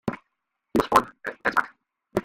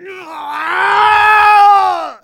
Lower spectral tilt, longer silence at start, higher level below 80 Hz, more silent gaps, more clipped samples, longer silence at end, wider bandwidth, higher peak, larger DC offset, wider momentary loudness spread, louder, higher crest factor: first, -5 dB/octave vs -2 dB/octave; about the same, 0.05 s vs 0 s; about the same, -52 dBFS vs -54 dBFS; neither; neither; about the same, 0 s vs 0.1 s; about the same, 16 kHz vs 17 kHz; second, -4 dBFS vs 0 dBFS; neither; about the same, 18 LU vs 17 LU; second, -25 LUFS vs -9 LUFS; first, 24 dB vs 10 dB